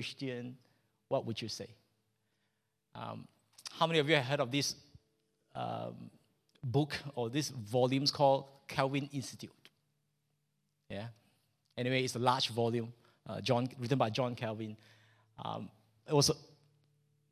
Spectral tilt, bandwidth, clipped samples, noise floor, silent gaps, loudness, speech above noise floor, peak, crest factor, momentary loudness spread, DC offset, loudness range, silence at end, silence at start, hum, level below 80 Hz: -4.5 dB/octave; 15 kHz; under 0.1%; -82 dBFS; none; -34 LUFS; 48 dB; -12 dBFS; 24 dB; 20 LU; under 0.1%; 8 LU; 0.9 s; 0 s; none; -70 dBFS